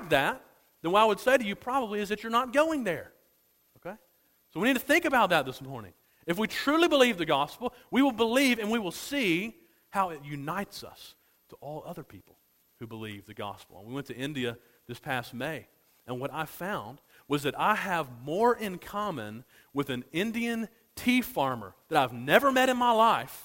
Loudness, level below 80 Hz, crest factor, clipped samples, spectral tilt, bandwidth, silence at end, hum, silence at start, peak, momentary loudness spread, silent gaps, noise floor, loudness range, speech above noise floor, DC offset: -28 LUFS; -64 dBFS; 26 dB; under 0.1%; -4.5 dB/octave; 16.5 kHz; 0 s; none; 0 s; -4 dBFS; 19 LU; none; -68 dBFS; 13 LU; 39 dB; under 0.1%